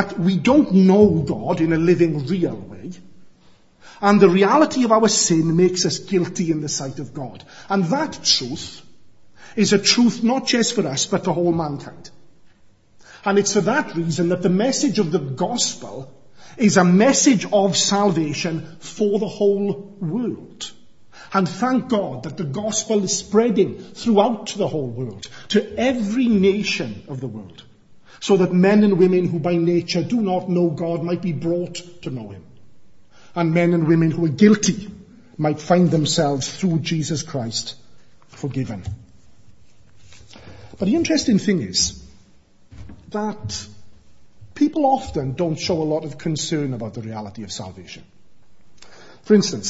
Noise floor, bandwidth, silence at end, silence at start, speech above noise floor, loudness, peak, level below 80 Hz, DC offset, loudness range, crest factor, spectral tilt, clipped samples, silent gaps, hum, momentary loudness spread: -55 dBFS; 8 kHz; 0 s; 0 s; 36 dB; -19 LUFS; 0 dBFS; -52 dBFS; 0.5%; 7 LU; 20 dB; -5 dB/octave; under 0.1%; none; none; 17 LU